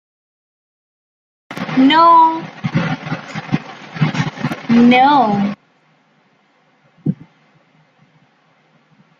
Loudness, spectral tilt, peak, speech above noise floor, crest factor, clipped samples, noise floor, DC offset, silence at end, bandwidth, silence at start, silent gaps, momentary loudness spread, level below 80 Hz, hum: -14 LUFS; -6.5 dB/octave; -2 dBFS; 46 dB; 16 dB; under 0.1%; -56 dBFS; under 0.1%; 2.05 s; 7.4 kHz; 1.5 s; none; 17 LU; -56 dBFS; none